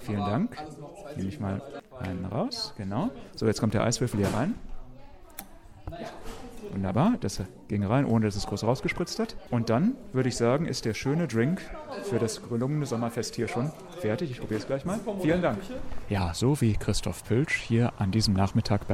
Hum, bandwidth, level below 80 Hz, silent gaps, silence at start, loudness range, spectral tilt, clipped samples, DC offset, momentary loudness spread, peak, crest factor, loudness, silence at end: none; 16 kHz; -46 dBFS; none; 0 s; 5 LU; -6 dB/octave; under 0.1%; under 0.1%; 15 LU; -10 dBFS; 18 dB; -29 LUFS; 0 s